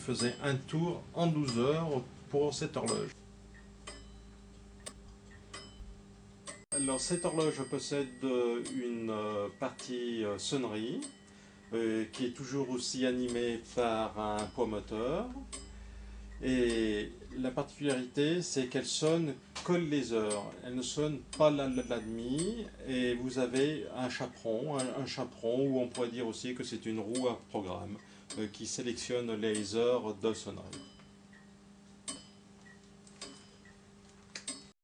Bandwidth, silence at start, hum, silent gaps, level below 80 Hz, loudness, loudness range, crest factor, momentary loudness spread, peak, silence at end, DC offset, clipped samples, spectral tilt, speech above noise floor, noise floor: 10.5 kHz; 0 s; none; none; -58 dBFS; -35 LUFS; 9 LU; 22 dB; 18 LU; -14 dBFS; 0.1 s; under 0.1%; under 0.1%; -4.5 dB/octave; 24 dB; -58 dBFS